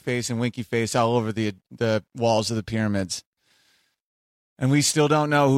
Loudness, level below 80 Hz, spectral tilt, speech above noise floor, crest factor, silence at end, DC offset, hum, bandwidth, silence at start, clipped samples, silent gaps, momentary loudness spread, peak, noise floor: -23 LUFS; -58 dBFS; -5 dB/octave; 43 dB; 16 dB; 0 s; under 0.1%; none; 16 kHz; 0.05 s; under 0.1%; 3.26-3.33 s, 4.02-4.56 s; 9 LU; -8 dBFS; -65 dBFS